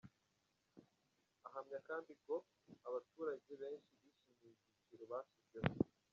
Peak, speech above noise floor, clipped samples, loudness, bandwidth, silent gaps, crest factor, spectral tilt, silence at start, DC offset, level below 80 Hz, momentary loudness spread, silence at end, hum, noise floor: -18 dBFS; 37 dB; under 0.1%; -48 LUFS; 7.2 kHz; none; 32 dB; -6.5 dB/octave; 0.05 s; under 0.1%; -76 dBFS; 15 LU; 0.25 s; none; -84 dBFS